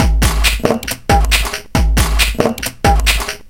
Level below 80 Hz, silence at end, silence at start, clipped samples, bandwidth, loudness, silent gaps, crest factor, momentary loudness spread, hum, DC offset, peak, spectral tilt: -16 dBFS; 0 s; 0 s; under 0.1%; 17 kHz; -14 LUFS; none; 14 dB; 5 LU; none; under 0.1%; 0 dBFS; -4 dB/octave